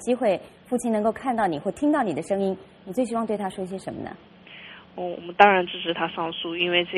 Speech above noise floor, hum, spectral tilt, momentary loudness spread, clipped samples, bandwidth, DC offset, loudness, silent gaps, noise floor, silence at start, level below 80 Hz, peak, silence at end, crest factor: 20 dB; none; -5 dB/octave; 18 LU; under 0.1%; 13 kHz; under 0.1%; -25 LUFS; none; -45 dBFS; 0 s; -62 dBFS; 0 dBFS; 0 s; 24 dB